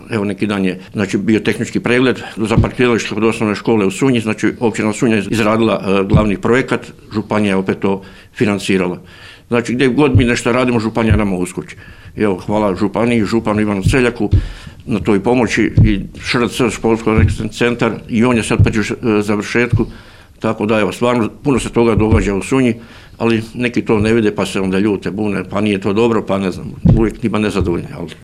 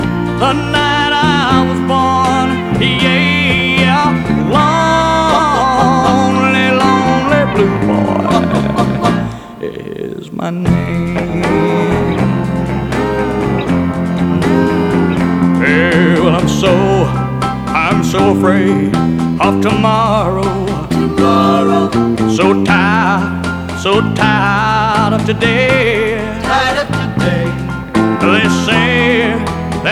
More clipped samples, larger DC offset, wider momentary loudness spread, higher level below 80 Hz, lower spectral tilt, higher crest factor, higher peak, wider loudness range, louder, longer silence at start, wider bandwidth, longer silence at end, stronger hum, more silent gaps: neither; first, 0.2% vs under 0.1%; about the same, 7 LU vs 6 LU; about the same, -30 dBFS vs -32 dBFS; about the same, -6.5 dB/octave vs -6 dB/octave; about the same, 14 dB vs 12 dB; about the same, 0 dBFS vs 0 dBFS; about the same, 2 LU vs 4 LU; second, -15 LUFS vs -12 LUFS; about the same, 0 s vs 0 s; about the same, 13.5 kHz vs 13.5 kHz; about the same, 0.1 s vs 0 s; neither; neither